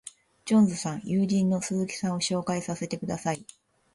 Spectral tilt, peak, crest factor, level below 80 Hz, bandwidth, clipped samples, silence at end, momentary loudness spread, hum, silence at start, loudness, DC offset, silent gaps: -5.5 dB/octave; -10 dBFS; 16 dB; -64 dBFS; 11.5 kHz; under 0.1%; 0.5 s; 10 LU; none; 0.05 s; -27 LUFS; under 0.1%; none